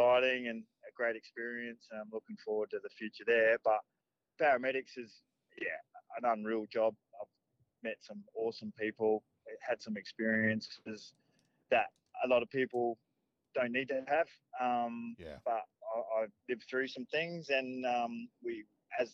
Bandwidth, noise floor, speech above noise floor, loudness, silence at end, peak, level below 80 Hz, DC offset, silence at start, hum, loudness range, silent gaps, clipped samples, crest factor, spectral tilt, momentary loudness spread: 7.4 kHz; -79 dBFS; 43 dB; -36 LUFS; 0.05 s; -20 dBFS; -80 dBFS; under 0.1%; 0 s; none; 5 LU; none; under 0.1%; 16 dB; -5.5 dB/octave; 16 LU